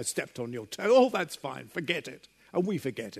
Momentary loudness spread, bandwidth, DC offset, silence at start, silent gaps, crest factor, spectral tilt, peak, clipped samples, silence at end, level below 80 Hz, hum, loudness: 14 LU; 13.5 kHz; under 0.1%; 0 s; none; 18 dB; -4.5 dB/octave; -10 dBFS; under 0.1%; 0 s; -74 dBFS; none; -29 LUFS